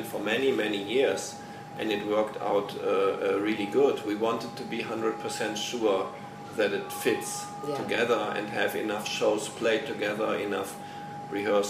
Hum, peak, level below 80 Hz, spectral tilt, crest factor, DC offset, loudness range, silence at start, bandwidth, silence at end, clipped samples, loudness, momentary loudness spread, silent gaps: 50 Hz at -65 dBFS; -12 dBFS; -72 dBFS; -4 dB/octave; 18 dB; under 0.1%; 2 LU; 0 s; 15.5 kHz; 0 s; under 0.1%; -29 LUFS; 9 LU; none